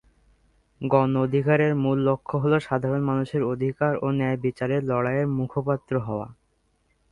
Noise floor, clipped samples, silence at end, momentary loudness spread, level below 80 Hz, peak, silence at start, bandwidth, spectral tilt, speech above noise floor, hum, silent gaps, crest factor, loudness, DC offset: -68 dBFS; under 0.1%; 0.8 s; 6 LU; -56 dBFS; -4 dBFS; 0.8 s; 10 kHz; -9 dB/octave; 45 dB; none; none; 20 dB; -24 LUFS; under 0.1%